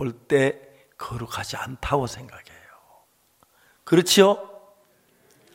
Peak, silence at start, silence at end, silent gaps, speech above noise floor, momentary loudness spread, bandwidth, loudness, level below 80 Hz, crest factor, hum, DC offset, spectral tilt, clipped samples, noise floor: -2 dBFS; 0 s; 1.05 s; none; 40 dB; 22 LU; 16.5 kHz; -22 LUFS; -50 dBFS; 22 dB; none; under 0.1%; -4 dB/octave; under 0.1%; -62 dBFS